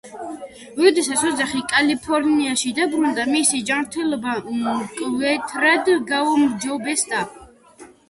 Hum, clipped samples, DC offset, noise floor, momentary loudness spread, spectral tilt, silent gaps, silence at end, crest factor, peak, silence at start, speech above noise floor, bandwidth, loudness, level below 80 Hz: none; under 0.1%; under 0.1%; -46 dBFS; 8 LU; -2 dB/octave; none; 0.25 s; 18 dB; -2 dBFS; 0.05 s; 26 dB; 11.5 kHz; -19 LUFS; -58 dBFS